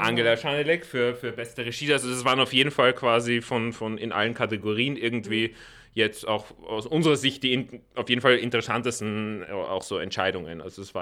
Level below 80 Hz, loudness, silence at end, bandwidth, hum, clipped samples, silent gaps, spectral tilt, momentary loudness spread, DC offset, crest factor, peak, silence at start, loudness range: -62 dBFS; -25 LUFS; 0 s; 16 kHz; none; under 0.1%; none; -4.5 dB/octave; 12 LU; under 0.1%; 20 dB; -4 dBFS; 0 s; 3 LU